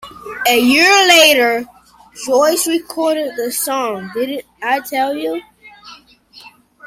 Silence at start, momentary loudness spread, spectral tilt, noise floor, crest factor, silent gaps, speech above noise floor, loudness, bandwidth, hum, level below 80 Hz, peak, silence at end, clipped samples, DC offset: 0 s; 16 LU; -1 dB/octave; -44 dBFS; 16 dB; none; 30 dB; -13 LUFS; 16.5 kHz; none; -58 dBFS; 0 dBFS; 0 s; under 0.1%; under 0.1%